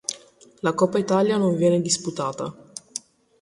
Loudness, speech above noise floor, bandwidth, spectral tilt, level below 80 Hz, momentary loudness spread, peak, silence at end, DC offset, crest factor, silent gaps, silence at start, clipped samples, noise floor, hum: -22 LUFS; 22 dB; 11.5 kHz; -5 dB/octave; -64 dBFS; 16 LU; -6 dBFS; 0.45 s; under 0.1%; 18 dB; none; 0.1 s; under 0.1%; -44 dBFS; none